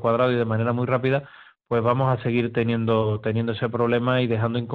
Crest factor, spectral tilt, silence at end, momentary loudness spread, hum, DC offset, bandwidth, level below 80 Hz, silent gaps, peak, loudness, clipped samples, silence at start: 16 dB; -9.5 dB/octave; 0 s; 4 LU; none; under 0.1%; 4.6 kHz; -58 dBFS; none; -6 dBFS; -23 LUFS; under 0.1%; 0 s